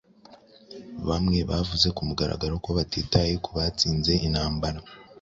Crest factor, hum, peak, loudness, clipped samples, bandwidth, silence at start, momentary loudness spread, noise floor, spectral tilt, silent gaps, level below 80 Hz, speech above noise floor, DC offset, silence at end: 20 dB; none; -6 dBFS; -25 LUFS; under 0.1%; 7.8 kHz; 0.3 s; 10 LU; -53 dBFS; -5.5 dB/octave; none; -38 dBFS; 27 dB; under 0.1%; 0.2 s